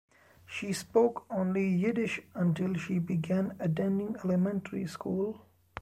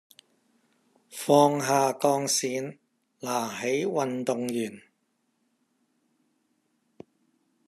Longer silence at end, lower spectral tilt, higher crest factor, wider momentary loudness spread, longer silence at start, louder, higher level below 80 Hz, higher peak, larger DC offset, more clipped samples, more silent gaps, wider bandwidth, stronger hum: second, 0 s vs 2.9 s; first, -7 dB/octave vs -4 dB/octave; second, 18 dB vs 24 dB; second, 9 LU vs 15 LU; second, 0.5 s vs 1.1 s; second, -31 LUFS vs -26 LUFS; first, -68 dBFS vs -78 dBFS; second, -14 dBFS vs -6 dBFS; neither; neither; neither; about the same, 14.5 kHz vs 14 kHz; neither